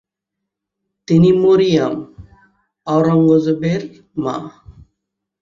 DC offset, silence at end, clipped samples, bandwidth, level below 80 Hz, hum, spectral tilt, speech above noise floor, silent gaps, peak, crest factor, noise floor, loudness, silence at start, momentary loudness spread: under 0.1%; 0.7 s; under 0.1%; 7.4 kHz; -50 dBFS; none; -8 dB/octave; 66 dB; none; -2 dBFS; 16 dB; -80 dBFS; -15 LUFS; 1.1 s; 16 LU